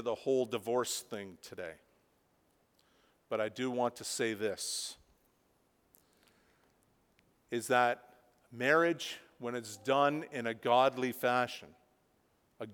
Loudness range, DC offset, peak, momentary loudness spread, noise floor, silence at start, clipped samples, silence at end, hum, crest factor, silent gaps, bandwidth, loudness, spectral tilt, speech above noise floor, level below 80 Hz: 8 LU; under 0.1%; -14 dBFS; 16 LU; -73 dBFS; 0 s; under 0.1%; 0 s; none; 22 dB; none; over 20 kHz; -33 LUFS; -3.5 dB/octave; 40 dB; -80 dBFS